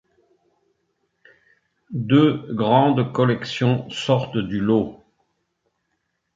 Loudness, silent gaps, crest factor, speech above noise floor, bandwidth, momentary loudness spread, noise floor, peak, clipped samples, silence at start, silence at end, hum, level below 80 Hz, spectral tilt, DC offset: -20 LUFS; none; 20 dB; 55 dB; 7.8 kHz; 8 LU; -74 dBFS; -4 dBFS; under 0.1%; 1.9 s; 1.4 s; none; -56 dBFS; -7.5 dB/octave; under 0.1%